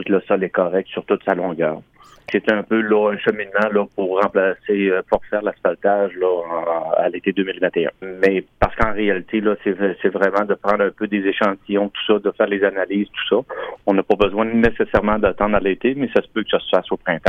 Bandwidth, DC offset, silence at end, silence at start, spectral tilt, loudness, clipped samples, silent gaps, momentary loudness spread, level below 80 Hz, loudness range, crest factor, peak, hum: 6.8 kHz; under 0.1%; 0 s; 0 s; -7.5 dB/octave; -19 LUFS; under 0.1%; none; 5 LU; -40 dBFS; 2 LU; 16 dB; -2 dBFS; none